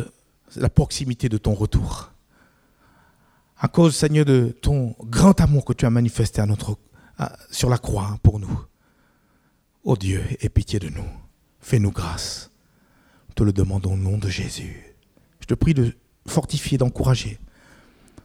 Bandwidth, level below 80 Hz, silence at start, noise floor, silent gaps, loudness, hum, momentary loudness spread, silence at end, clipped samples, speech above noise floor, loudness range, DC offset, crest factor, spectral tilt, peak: 15.5 kHz; -34 dBFS; 0 s; -63 dBFS; none; -22 LUFS; none; 15 LU; 0.8 s; under 0.1%; 43 dB; 7 LU; under 0.1%; 20 dB; -6.5 dB/octave; -2 dBFS